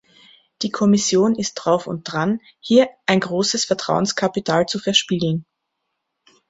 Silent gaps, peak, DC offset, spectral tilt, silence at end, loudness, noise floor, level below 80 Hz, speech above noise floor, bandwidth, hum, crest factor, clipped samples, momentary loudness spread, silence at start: none; -2 dBFS; under 0.1%; -4 dB/octave; 1.05 s; -19 LUFS; -76 dBFS; -60 dBFS; 57 dB; 8 kHz; none; 18 dB; under 0.1%; 7 LU; 0.6 s